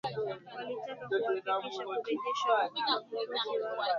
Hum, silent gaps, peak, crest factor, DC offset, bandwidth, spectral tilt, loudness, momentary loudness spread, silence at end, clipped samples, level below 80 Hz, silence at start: none; none; -16 dBFS; 18 dB; under 0.1%; 7.4 kHz; -1 dB/octave; -34 LUFS; 10 LU; 0 s; under 0.1%; -80 dBFS; 0.05 s